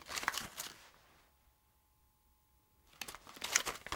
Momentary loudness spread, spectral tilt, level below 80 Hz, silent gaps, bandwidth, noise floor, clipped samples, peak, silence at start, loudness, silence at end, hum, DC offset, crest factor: 14 LU; 0.5 dB/octave; -70 dBFS; none; 18 kHz; -73 dBFS; under 0.1%; -8 dBFS; 0 s; -39 LUFS; 0 s; none; under 0.1%; 36 dB